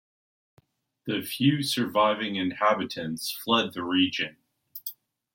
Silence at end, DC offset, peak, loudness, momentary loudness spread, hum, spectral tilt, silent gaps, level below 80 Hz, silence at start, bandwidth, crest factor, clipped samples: 0.4 s; under 0.1%; -8 dBFS; -26 LUFS; 14 LU; none; -4.5 dB/octave; none; -72 dBFS; 1.05 s; 17 kHz; 20 dB; under 0.1%